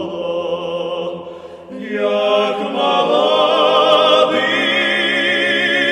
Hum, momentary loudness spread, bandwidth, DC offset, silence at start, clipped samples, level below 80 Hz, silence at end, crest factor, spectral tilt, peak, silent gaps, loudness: none; 14 LU; 12 kHz; under 0.1%; 0 s; under 0.1%; -64 dBFS; 0 s; 16 dB; -3.5 dB/octave; 0 dBFS; none; -15 LUFS